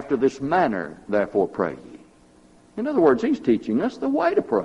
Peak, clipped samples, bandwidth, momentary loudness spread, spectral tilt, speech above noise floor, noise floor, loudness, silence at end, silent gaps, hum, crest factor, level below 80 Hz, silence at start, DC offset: -4 dBFS; under 0.1%; 10.5 kHz; 10 LU; -7 dB/octave; 31 dB; -53 dBFS; -22 LUFS; 0 s; none; none; 18 dB; -58 dBFS; 0 s; under 0.1%